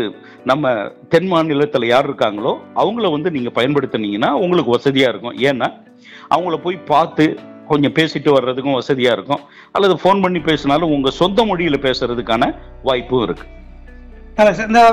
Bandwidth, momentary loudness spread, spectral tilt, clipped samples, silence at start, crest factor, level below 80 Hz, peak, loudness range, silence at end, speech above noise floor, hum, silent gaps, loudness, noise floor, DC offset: 14 kHz; 7 LU; -6 dB/octave; under 0.1%; 0 s; 14 dB; -42 dBFS; -2 dBFS; 2 LU; 0 s; 21 dB; none; none; -16 LUFS; -36 dBFS; under 0.1%